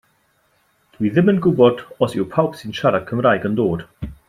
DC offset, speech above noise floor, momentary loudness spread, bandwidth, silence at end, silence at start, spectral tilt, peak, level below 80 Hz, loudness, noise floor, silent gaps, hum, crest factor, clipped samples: under 0.1%; 44 dB; 8 LU; 14 kHz; 0.15 s; 1 s; -8 dB/octave; -2 dBFS; -48 dBFS; -18 LUFS; -62 dBFS; none; none; 18 dB; under 0.1%